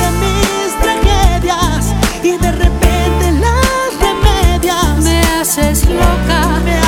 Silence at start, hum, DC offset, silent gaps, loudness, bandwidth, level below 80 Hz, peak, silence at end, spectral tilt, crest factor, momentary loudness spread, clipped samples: 0 s; none; under 0.1%; none; -12 LUFS; 18 kHz; -14 dBFS; 0 dBFS; 0 s; -4.5 dB/octave; 10 dB; 3 LU; under 0.1%